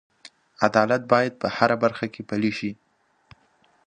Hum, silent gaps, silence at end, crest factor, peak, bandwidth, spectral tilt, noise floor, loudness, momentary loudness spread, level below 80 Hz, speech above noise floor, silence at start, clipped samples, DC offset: none; none; 1.15 s; 24 dB; 0 dBFS; 9.8 kHz; -6 dB/octave; -62 dBFS; -23 LUFS; 10 LU; -64 dBFS; 40 dB; 0.6 s; under 0.1%; under 0.1%